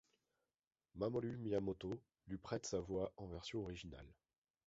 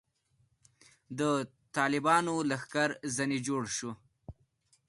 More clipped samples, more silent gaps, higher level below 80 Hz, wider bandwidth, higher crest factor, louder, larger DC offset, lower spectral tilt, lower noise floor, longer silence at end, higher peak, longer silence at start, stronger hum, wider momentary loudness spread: neither; neither; about the same, -66 dBFS vs -68 dBFS; second, 7.6 kHz vs 11.5 kHz; about the same, 20 dB vs 20 dB; second, -46 LUFS vs -31 LUFS; neither; first, -6 dB/octave vs -4 dB/octave; first, under -90 dBFS vs -73 dBFS; about the same, 0.55 s vs 0.55 s; second, -28 dBFS vs -14 dBFS; second, 0.95 s vs 1.1 s; neither; first, 13 LU vs 10 LU